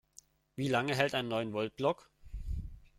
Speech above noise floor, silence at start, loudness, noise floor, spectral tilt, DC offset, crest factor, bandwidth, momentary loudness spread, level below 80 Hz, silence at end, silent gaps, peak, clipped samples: 29 dB; 0.55 s; -34 LUFS; -62 dBFS; -5.5 dB/octave; under 0.1%; 22 dB; 15.5 kHz; 16 LU; -48 dBFS; 0.15 s; none; -12 dBFS; under 0.1%